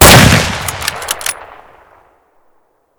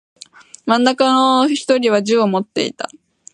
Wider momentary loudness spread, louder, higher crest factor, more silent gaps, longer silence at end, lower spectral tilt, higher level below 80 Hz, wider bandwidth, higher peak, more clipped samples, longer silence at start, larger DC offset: first, 16 LU vs 13 LU; first, -10 LUFS vs -15 LUFS; about the same, 12 dB vs 16 dB; neither; first, 1.55 s vs 0.45 s; about the same, -3.5 dB/octave vs -4.5 dB/octave; first, -26 dBFS vs -70 dBFS; first, over 20 kHz vs 11 kHz; about the same, 0 dBFS vs -2 dBFS; first, 4% vs under 0.1%; second, 0 s vs 0.65 s; neither